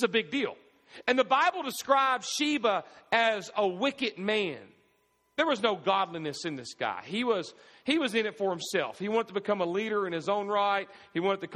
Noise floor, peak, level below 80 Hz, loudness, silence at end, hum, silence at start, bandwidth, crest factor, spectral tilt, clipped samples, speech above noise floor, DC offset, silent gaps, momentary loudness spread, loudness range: -71 dBFS; -10 dBFS; -76 dBFS; -29 LUFS; 0 s; none; 0 s; 15 kHz; 20 dB; -3.5 dB/octave; under 0.1%; 42 dB; under 0.1%; none; 9 LU; 4 LU